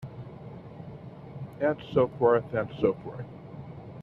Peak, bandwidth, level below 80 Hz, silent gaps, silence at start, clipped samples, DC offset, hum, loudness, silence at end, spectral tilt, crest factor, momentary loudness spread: -10 dBFS; 5.4 kHz; -60 dBFS; none; 0 s; under 0.1%; under 0.1%; none; -27 LUFS; 0 s; -9.5 dB/octave; 20 dB; 20 LU